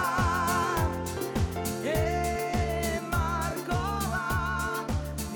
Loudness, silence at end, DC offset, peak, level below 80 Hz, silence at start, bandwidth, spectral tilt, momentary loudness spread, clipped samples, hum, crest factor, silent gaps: -29 LUFS; 0 s; under 0.1%; -16 dBFS; -38 dBFS; 0 s; over 20 kHz; -5 dB/octave; 5 LU; under 0.1%; none; 12 dB; none